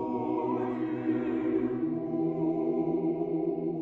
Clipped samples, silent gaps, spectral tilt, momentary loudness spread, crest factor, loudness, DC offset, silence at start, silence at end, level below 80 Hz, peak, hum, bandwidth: under 0.1%; none; -10.5 dB/octave; 2 LU; 12 dB; -30 LUFS; under 0.1%; 0 s; 0 s; -64 dBFS; -16 dBFS; none; 4 kHz